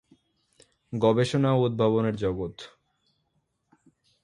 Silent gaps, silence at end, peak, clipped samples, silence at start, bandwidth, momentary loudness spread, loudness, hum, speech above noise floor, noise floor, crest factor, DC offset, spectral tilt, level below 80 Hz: none; 1.55 s; -8 dBFS; under 0.1%; 0.9 s; 11.5 kHz; 14 LU; -25 LUFS; none; 50 dB; -75 dBFS; 20 dB; under 0.1%; -7.5 dB/octave; -56 dBFS